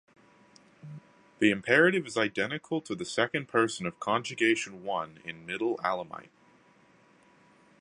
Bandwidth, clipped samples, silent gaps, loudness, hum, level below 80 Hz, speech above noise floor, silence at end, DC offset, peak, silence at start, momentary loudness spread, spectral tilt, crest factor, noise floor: 11 kHz; under 0.1%; none; -29 LUFS; none; -72 dBFS; 32 dB; 1.6 s; under 0.1%; -8 dBFS; 0.85 s; 19 LU; -4.5 dB/octave; 24 dB; -62 dBFS